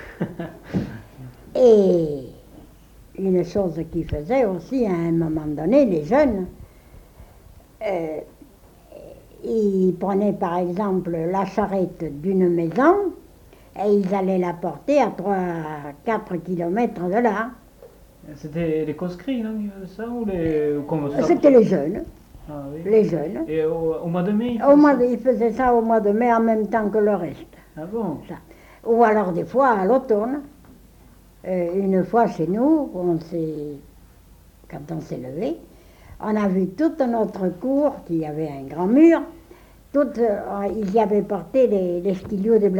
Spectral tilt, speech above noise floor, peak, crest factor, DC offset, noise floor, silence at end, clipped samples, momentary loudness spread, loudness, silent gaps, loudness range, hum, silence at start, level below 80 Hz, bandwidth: -8.5 dB/octave; 29 dB; -4 dBFS; 18 dB; under 0.1%; -49 dBFS; 0 s; under 0.1%; 15 LU; -21 LUFS; none; 7 LU; none; 0 s; -48 dBFS; 19 kHz